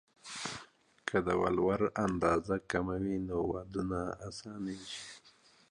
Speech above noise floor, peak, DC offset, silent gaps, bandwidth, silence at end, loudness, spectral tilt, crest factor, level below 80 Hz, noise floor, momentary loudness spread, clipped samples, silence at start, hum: 30 dB; -16 dBFS; under 0.1%; none; 11.5 kHz; 0.4 s; -35 LUFS; -5.5 dB/octave; 18 dB; -56 dBFS; -64 dBFS; 14 LU; under 0.1%; 0.25 s; none